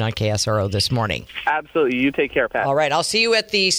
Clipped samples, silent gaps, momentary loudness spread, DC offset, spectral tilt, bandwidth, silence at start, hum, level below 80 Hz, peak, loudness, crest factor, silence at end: under 0.1%; none; 6 LU; under 0.1%; -4 dB/octave; over 20 kHz; 0 s; none; -48 dBFS; -6 dBFS; -19 LUFS; 14 dB; 0 s